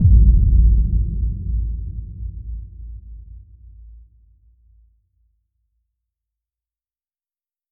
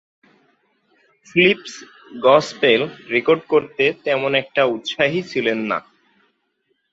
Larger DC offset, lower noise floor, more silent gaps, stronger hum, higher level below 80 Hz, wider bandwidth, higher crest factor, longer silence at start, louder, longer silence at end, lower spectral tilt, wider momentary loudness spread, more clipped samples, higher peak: neither; first, under -90 dBFS vs -69 dBFS; neither; neither; first, -20 dBFS vs -62 dBFS; second, 0.5 kHz vs 8 kHz; about the same, 18 dB vs 20 dB; second, 0 s vs 1.35 s; about the same, -19 LUFS vs -18 LUFS; first, 4.35 s vs 1.1 s; first, -21 dB/octave vs -5 dB/octave; first, 24 LU vs 9 LU; neither; about the same, -2 dBFS vs 0 dBFS